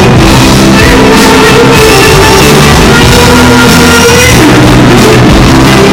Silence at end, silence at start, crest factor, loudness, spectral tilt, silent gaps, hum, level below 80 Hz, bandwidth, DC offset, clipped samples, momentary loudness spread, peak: 0 s; 0 s; 2 dB; -1 LUFS; -4.5 dB/octave; none; none; -14 dBFS; over 20 kHz; under 0.1%; 30%; 1 LU; 0 dBFS